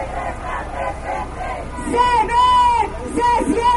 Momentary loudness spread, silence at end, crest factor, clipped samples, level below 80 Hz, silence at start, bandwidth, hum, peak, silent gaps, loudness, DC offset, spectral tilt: 13 LU; 0 s; 14 dB; under 0.1%; -32 dBFS; 0 s; 11.5 kHz; none; -4 dBFS; none; -18 LUFS; under 0.1%; -4.5 dB/octave